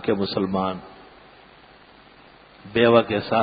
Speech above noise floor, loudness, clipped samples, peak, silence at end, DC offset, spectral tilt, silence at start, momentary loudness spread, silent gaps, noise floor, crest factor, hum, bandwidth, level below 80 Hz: 29 dB; -21 LUFS; under 0.1%; -2 dBFS; 0 s; under 0.1%; -10.5 dB/octave; 0 s; 11 LU; none; -50 dBFS; 22 dB; none; 5 kHz; -54 dBFS